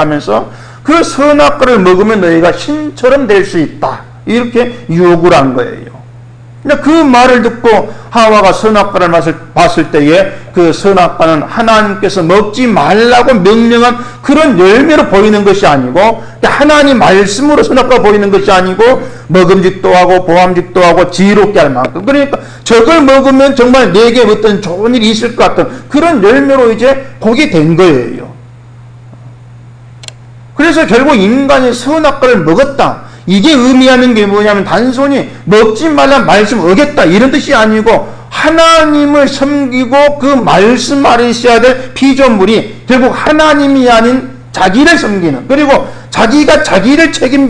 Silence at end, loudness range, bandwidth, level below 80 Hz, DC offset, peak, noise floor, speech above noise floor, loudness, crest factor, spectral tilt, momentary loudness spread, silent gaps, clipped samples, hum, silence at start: 0 s; 3 LU; 10.5 kHz; -32 dBFS; under 0.1%; 0 dBFS; -31 dBFS; 25 dB; -6 LUFS; 6 dB; -5 dB/octave; 7 LU; none; 2%; none; 0 s